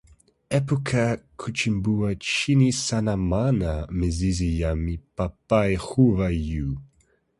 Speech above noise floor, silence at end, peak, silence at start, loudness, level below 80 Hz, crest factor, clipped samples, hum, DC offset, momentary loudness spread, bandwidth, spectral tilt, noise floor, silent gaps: 41 dB; 0.55 s; -6 dBFS; 0.5 s; -24 LUFS; -36 dBFS; 18 dB; under 0.1%; none; under 0.1%; 10 LU; 11.5 kHz; -6 dB/octave; -64 dBFS; none